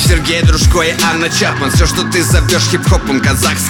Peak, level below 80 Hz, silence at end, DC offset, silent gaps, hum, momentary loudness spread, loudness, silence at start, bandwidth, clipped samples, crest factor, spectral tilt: 0 dBFS; -18 dBFS; 0 s; under 0.1%; none; none; 2 LU; -11 LUFS; 0 s; 18 kHz; under 0.1%; 10 dB; -4 dB/octave